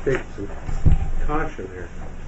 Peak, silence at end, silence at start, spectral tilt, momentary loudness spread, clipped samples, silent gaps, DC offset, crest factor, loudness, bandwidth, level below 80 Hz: -6 dBFS; 0 s; 0 s; -7.5 dB/octave; 13 LU; under 0.1%; none; under 0.1%; 14 dB; -26 LUFS; 7.8 kHz; -22 dBFS